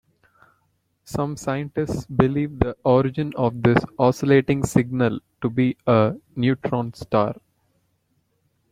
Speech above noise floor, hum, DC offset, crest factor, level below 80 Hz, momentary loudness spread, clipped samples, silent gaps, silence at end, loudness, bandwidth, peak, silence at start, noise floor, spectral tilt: 48 dB; none; under 0.1%; 20 dB; -48 dBFS; 8 LU; under 0.1%; none; 1.4 s; -22 LUFS; 15.5 kHz; -2 dBFS; 1.1 s; -69 dBFS; -7.5 dB/octave